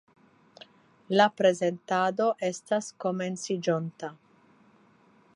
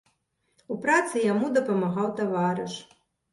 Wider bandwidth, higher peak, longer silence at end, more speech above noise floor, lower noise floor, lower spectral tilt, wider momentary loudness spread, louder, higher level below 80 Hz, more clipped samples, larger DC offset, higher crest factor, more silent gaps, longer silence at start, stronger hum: about the same, 11 kHz vs 11.5 kHz; about the same, -8 dBFS vs -10 dBFS; first, 1.2 s vs 0.5 s; second, 34 dB vs 47 dB; second, -61 dBFS vs -73 dBFS; about the same, -5 dB/octave vs -5.5 dB/octave; second, 9 LU vs 12 LU; about the same, -27 LUFS vs -26 LUFS; second, -82 dBFS vs -72 dBFS; neither; neither; about the same, 22 dB vs 18 dB; neither; first, 1.1 s vs 0.7 s; neither